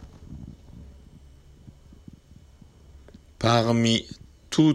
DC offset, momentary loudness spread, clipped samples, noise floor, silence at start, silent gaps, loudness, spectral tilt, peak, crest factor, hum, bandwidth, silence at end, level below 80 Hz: under 0.1%; 26 LU; under 0.1%; -51 dBFS; 0 s; none; -23 LUFS; -5.5 dB/octave; -8 dBFS; 20 dB; none; 12 kHz; 0 s; -50 dBFS